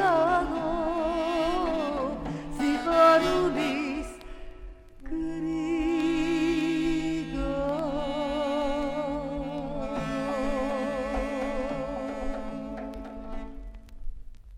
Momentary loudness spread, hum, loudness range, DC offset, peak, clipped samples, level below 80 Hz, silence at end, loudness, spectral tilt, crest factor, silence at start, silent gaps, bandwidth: 16 LU; none; 7 LU; under 0.1%; -8 dBFS; under 0.1%; -42 dBFS; 0 s; -28 LUFS; -5.5 dB/octave; 20 dB; 0 s; none; 13.5 kHz